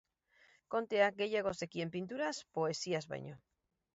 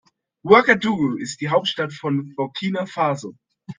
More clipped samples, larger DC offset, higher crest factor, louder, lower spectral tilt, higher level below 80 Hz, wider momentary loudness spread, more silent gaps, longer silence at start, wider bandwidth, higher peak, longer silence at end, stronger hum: neither; neither; about the same, 20 dB vs 20 dB; second, -37 LUFS vs -20 LUFS; second, -3.5 dB/octave vs -5 dB/octave; second, -74 dBFS vs -64 dBFS; second, 10 LU vs 14 LU; neither; first, 0.7 s vs 0.45 s; second, 7.6 kHz vs 9.8 kHz; second, -18 dBFS vs 0 dBFS; first, 0.6 s vs 0.05 s; neither